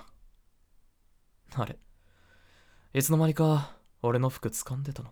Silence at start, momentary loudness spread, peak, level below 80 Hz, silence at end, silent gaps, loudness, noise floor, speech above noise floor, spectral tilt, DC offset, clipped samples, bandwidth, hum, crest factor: 0 s; 14 LU; -12 dBFS; -58 dBFS; 0 s; none; -29 LUFS; -64 dBFS; 37 dB; -6 dB/octave; under 0.1%; under 0.1%; over 20 kHz; none; 20 dB